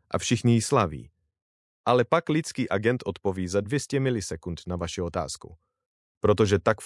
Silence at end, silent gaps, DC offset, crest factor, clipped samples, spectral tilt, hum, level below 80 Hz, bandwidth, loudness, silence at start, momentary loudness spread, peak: 0 s; 1.42-1.84 s, 5.86-6.21 s; under 0.1%; 22 dB; under 0.1%; -5.5 dB/octave; none; -56 dBFS; 12 kHz; -26 LUFS; 0.1 s; 11 LU; -6 dBFS